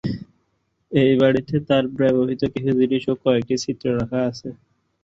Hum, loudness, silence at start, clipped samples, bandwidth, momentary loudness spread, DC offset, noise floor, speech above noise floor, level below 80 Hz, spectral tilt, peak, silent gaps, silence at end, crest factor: none; -20 LUFS; 0.05 s; under 0.1%; 7.8 kHz; 9 LU; under 0.1%; -69 dBFS; 50 dB; -50 dBFS; -6.5 dB/octave; -4 dBFS; none; 0.5 s; 18 dB